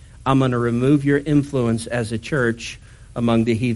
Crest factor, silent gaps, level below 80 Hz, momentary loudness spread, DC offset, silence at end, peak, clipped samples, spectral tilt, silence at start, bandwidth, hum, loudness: 16 dB; none; -44 dBFS; 11 LU; under 0.1%; 0 s; -4 dBFS; under 0.1%; -7 dB/octave; 0.2 s; 11.5 kHz; none; -20 LUFS